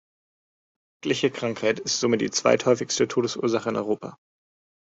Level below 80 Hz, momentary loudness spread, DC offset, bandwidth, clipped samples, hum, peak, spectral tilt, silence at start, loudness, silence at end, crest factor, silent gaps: -66 dBFS; 8 LU; under 0.1%; 8 kHz; under 0.1%; none; -4 dBFS; -3.5 dB/octave; 1.05 s; -24 LUFS; 0.7 s; 20 dB; none